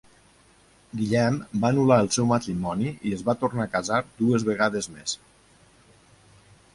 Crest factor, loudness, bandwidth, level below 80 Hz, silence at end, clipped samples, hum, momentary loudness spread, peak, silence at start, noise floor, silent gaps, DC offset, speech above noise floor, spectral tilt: 20 dB; -24 LUFS; 11.5 kHz; -56 dBFS; 1.6 s; under 0.1%; none; 11 LU; -6 dBFS; 0.95 s; -57 dBFS; none; under 0.1%; 34 dB; -5.5 dB/octave